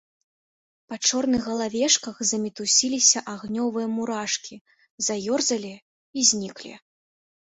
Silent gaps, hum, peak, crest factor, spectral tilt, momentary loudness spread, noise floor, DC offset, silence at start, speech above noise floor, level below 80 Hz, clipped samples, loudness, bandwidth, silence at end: 4.61-4.65 s, 4.90-4.98 s, 5.82-6.13 s; none; -4 dBFS; 22 dB; -1.5 dB/octave; 17 LU; under -90 dBFS; under 0.1%; 0.9 s; over 65 dB; -64 dBFS; under 0.1%; -23 LUFS; 8.4 kHz; 0.7 s